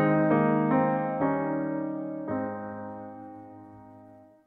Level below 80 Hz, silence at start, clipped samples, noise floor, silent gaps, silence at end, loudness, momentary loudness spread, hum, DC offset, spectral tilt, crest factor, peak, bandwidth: -66 dBFS; 0 s; under 0.1%; -52 dBFS; none; 0.3 s; -27 LUFS; 22 LU; none; under 0.1%; -11.5 dB/octave; 18 dB; -10 dBFS; 4.1 kHz